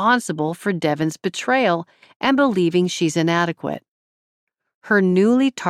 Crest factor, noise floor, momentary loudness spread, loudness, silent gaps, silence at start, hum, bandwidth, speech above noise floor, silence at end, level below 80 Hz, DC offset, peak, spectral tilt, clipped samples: 16 dB; under -90 dBFS; 9 LU; -19 LUFS; 2.16-2.20 s, 3.88-4.47 s, 4.74-4.81 s; 0 s; none; 14 kHz; over 71 dB; 0 s; -66 dBFS; under 0.1%; -4 dBFS; -5.5 dB/octave; under 0.1%